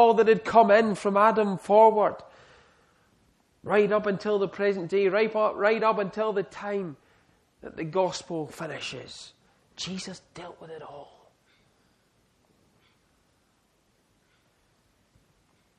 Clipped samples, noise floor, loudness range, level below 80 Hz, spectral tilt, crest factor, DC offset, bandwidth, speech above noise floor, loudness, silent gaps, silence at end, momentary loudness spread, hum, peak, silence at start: under 0.1%; -68 dBFS; 19 LU; -68 dBFS; -5.5 dB/octave; 22 dB; under 0.1%; 11.5 kHz; 44 dB; -24 LUFS; none; 4.75 s; 24 LU; none; -6 dBFS; 0 s